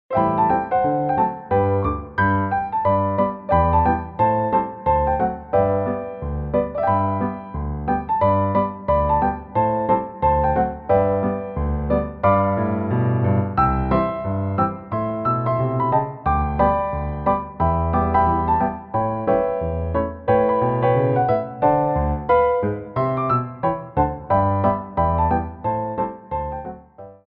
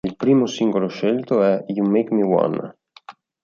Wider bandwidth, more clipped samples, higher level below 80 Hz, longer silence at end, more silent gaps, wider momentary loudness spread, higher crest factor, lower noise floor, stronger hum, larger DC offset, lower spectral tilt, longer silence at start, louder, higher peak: second, 5 kHz vs 7.2 kHz; neither; first, -34 dBFS vs -60 dBFS; second, 0.15 s vs 0.3 s; neither; about the same, 7 LU vs 5 LU; about the same, 16 dB vs 16 dB; about the same, -42 dBFS vs -45 dBFS; neither; neither; first, -11.5 dB/octave vs -7 dB/octave; about the same, 0.1 s vs 0.05 s; about the same, -21 LUFS vs -19 LUFS; about the same, -4 dBFS vs -4 dBFS